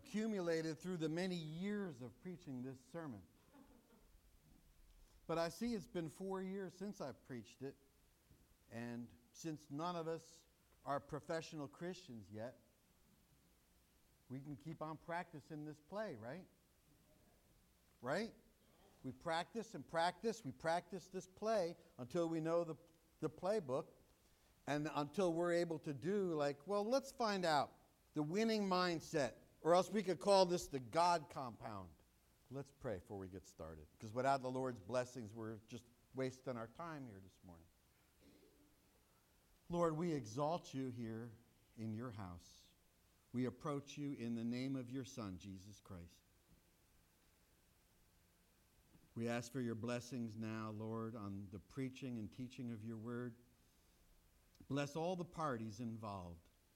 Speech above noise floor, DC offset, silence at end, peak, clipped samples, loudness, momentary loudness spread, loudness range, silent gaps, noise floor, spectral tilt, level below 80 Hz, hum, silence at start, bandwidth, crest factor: 31 dB; under 0.1%; 0.35 s; -20 dBFS; under 0.1%; -44 LUFS; 16 LU; 13 LU; none; -75 dBFS; -5.5 dB/octave; -74 dBFS; none; 0 s; 16.5 kHz; 26 dB